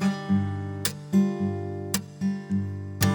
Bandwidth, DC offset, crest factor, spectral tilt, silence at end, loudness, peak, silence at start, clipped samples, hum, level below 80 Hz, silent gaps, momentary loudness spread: 19.5 kHz; under 0.1%; 18 dB; -5.5 dB/octave; 0 s; -28 LUFS; -8 dBFS; 0 s; under 0.1%; none; -60 dBFS; none; 6 LU